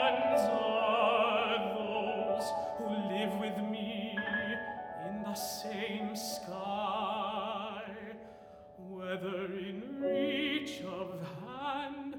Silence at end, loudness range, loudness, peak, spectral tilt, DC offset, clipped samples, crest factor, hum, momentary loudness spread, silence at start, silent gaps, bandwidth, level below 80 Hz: 0 s; 7 LU; -35 LUFS; -16 dBFS; -4.5 dB/octave; under 0.1%; under 0.1%; 20 dB; none; 14 LU; 0 s; none; over 20 kHz; -70 dBFS